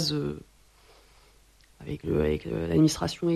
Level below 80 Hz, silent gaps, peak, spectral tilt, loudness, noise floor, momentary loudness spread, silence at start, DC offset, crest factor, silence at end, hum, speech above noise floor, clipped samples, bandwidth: -46 dBFS; none; -10 dBFS; -6 dB/octave; -27 LUFS; -59 dBFS; 17 LU; 0 s; under 0.1%; 18 dB; 0 s; none; 32 dB; under 0.1%; 13 kHz